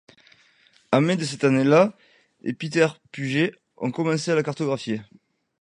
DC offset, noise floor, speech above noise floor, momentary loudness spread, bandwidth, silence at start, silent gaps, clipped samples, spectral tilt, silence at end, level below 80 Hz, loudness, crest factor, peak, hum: under 0.1%; -59 dBFS; 37 dB; 13 LU; 11 kHz; 0.9 s; none; under 0.1%; -6 dB/octave; 0.55 s; -70 dBFS; -23 LUFS; 20 dB; -4 dBFS; none